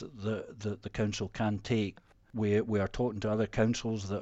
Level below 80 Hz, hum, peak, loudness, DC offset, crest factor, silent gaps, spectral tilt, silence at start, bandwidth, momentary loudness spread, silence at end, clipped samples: -52 dBFS; none; -16 dBFS; -33 LUFS; under 0.1%; 16 dB; none; -6.5 dB/octave; 0 s; 8.2 kHz; 8 LU; 0 s; under 0.1%